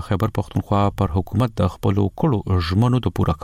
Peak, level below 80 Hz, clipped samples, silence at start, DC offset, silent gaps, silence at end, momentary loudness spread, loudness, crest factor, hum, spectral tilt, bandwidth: -8 dBFS; -36 dBFS; under 0.1%; 0 s; under 0.1%; none; 0.05 s; 4 LU; -21 LUFS; 12 dB; none; -8 dB/octave; 15 kHz